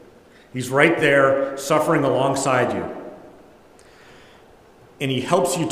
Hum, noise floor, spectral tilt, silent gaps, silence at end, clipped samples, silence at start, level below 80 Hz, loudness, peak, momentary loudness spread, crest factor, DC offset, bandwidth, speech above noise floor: none; -49 dBFS; -4.5 dB/octave; none; 0 s; under 0.1%; 0.55 s; -60 dBFS; -19 LUFS; 0 dBFS; 16 LU; 20 dB; under 0.1%; 16 kHz; 30 dB